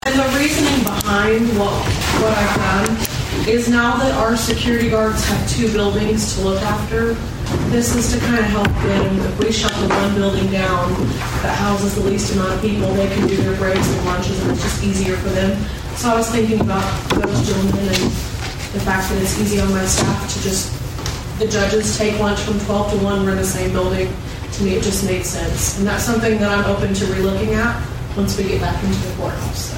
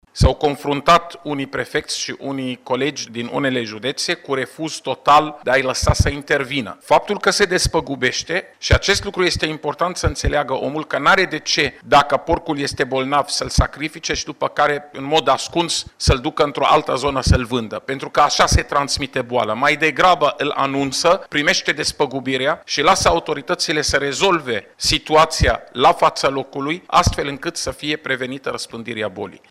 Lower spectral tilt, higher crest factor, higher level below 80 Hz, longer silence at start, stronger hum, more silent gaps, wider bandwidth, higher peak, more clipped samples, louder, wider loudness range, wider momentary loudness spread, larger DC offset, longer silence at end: first, -5 dB/octave vs -3.5 dB/octave; about the same, 18 dB vs 16 dB; about the same, -28 dBFS vs -32 dBFS; about the same, 0.05 s vs 0.15 s; neither; neither; about the same, 16.5 kHz vs 16 kHz; first, 0 dBFS vs -4 dBFS; neither; about the same, -18 LUFS vs -18 LUFS; about the same, 2 LU vs 3 LU; second, 5 LU vs 10 LU; neither; second, 0 s vs 0.15 s